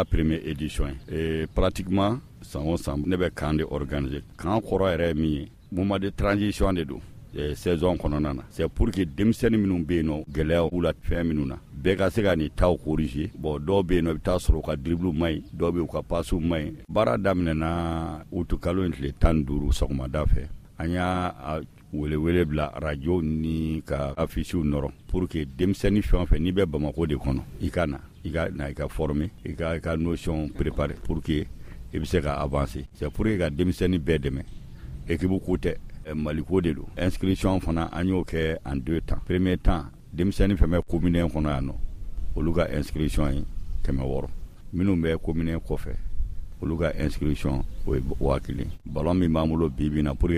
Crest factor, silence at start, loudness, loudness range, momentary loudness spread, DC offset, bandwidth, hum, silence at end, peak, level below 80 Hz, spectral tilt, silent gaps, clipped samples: 18 dB; 0 s; -27 LUFS; 4 LU; 9 LU; under 0.1%; 15.5 kHz; none; 0 s; -8 dBFS; -32 dBFS; -7.5 dB/octave; none; under 0.1%